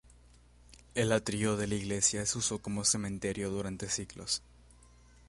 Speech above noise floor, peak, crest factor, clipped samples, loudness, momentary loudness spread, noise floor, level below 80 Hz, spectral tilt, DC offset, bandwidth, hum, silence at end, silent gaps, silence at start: 26 dB; -14 dBFS; 20 dB; under 0.1%; -32 LUFS; 7 LU; -59 dBFS; -56 dBFS; -3.5 dB/octave; under 0.1%; 11.5 kHz; 60 Hz at -55 dBFS; 0.9 s; none; 0.7 s